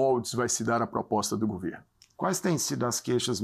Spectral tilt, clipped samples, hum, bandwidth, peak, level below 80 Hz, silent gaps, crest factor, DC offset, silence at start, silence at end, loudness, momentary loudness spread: -4 dB/octave; under 0.1%; none; 15.5 kHz; -14 dBFS; -64 dBFS; none; 16 dB; under 0.1%; 0 s; 0 s; -29 LUFS; 7 LU